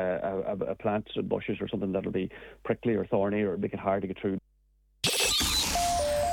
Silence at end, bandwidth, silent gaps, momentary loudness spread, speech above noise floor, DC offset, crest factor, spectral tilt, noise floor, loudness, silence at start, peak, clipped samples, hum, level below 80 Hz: 0 s; 19 kHz; none; 9 LU; 36 dB; under 0.1%; 16 dB; -3.5 dB/octave; -66 dBFS; -29 LUFS; 0 s; -14 dBFS; under 0.1%; none; -48 dBFS